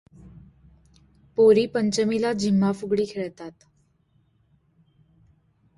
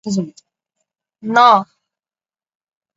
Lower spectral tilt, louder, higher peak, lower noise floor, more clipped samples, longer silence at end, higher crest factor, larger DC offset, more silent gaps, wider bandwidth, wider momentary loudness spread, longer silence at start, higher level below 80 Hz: about the same, -6 dB/octave vs -5 dB/octave; second, -22 LUFS vs -13 LUFS; second, -8 dBFS vs 0 dBFS; second, -65 dBFS vs under -90 dBFS; neither; first, 2.3 s vs 1.35 s; about the same, 18 dB vs 18 dB; neither; neither; first, 11.5 kHz vs 8 kHz; second, 16 LU vs 21 LU; first, 0.25 s vs 0.05 s; first, -60 dBFS vs -66 dBFS